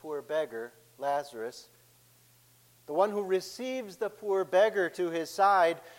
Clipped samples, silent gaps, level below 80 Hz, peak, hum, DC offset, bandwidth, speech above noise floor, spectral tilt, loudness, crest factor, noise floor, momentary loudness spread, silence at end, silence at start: under 0.1%; none; -80 dBFS; -14 dBFS; none; under 0.1%; 16.5 kHz; 32 dB; -4 dB/octave; -30 LUFS; 18 dB; -62 dBFS; 15 LU; 0.05 s; 0.05 s